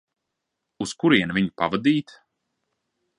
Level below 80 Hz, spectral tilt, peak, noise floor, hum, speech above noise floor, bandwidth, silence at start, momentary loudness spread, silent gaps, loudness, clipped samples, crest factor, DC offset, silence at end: -60 dBFS; -5.5 dB/octave; -4 dBFS; -81 dBFS; none; 59 dB; 11 kHz; 0.8 s; 10 LU; none; -22 LUFS; under 0.1%; 20 dB; under 0.1%; 1.15 s